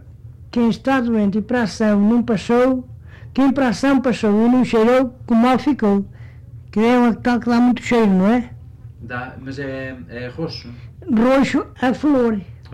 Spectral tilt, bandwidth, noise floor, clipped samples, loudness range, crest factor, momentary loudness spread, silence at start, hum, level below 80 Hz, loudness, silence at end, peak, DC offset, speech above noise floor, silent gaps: -7 dB/octave; 10 kHz; -39 dBFS; under 0.1%; 5 LU; 8 dB; 15 LU; 0.05 s; none; -44 dBFS; -17 LUFS; 0 s; -10 dBFS; under 0.1%; 22 dB; none